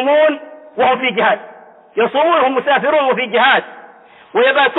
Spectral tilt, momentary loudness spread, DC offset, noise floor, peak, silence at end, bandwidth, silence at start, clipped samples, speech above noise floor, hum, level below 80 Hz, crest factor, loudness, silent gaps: -7.5 dB/octave; 11 LU; under 0.1%; -42 dBFS; -2 dBFS; 0 s; 4.1 kHz; 0 s; under 0.1%; 28 dB; none; -66 dBFS; 12 dB; -14 LUFS; none